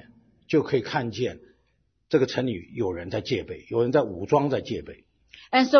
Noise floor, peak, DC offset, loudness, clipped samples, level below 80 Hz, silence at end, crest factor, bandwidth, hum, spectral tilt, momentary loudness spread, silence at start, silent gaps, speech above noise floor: -70 dBFS; -6 dBFS; under 0.1%; -26 LUFS; under 0.1%; -58 dBFS; 0 s; 20 dB; 6.6 kHz; none; -6.5 dB/octave; 8 LU; 0.5 s; none; 46 dB